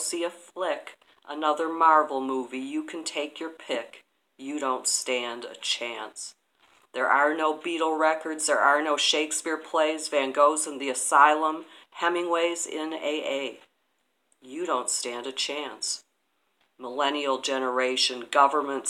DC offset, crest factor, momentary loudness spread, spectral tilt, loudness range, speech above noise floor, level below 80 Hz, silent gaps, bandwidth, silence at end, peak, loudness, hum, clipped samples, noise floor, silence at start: under 0.1%; 24 dB; 14 LU; 0 dB/octave; 7 LU; 48 dB; -90 dBFS; none; 15.5 kHz; 0 s; -4 dBFS; -26 LUFS; none; under 0.1%; -74 dBFS; 0 s